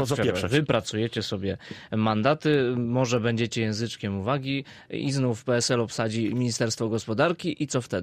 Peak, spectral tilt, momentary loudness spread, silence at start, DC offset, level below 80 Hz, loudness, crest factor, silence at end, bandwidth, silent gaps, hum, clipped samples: -10 dBFS; -5 dB/octave; 7 LU; 0 s; under 0.1%; -58 dBFS; -26 LUFS; 16 dB; 0 s; 15.5 kHz; none; none; under 0.1%